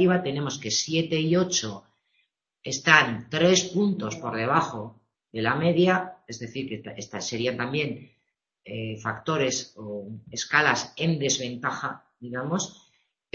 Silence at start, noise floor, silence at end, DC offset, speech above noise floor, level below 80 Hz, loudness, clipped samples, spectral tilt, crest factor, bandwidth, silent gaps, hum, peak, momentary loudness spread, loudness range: 0 s; -77 dBFS; 0.6 s; under 0.1%; 51 dB; -64 dBFS; -25 LUFS; under 0.1%; -4 dB/octave; 26 dB; 7.6 kHz; none; none; 0 dBFS; 16 LU; 7 LU